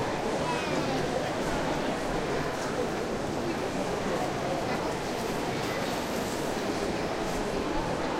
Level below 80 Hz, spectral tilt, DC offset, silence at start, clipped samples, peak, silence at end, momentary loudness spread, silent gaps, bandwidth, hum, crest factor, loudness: -46 dBFS; -4.5 dB/octave; under 0.1%; 0 s; under 0.1%; -16 dBFS; 0 s; 2 LU; none; 16 kHz; none; 14 dB; -30 LUFS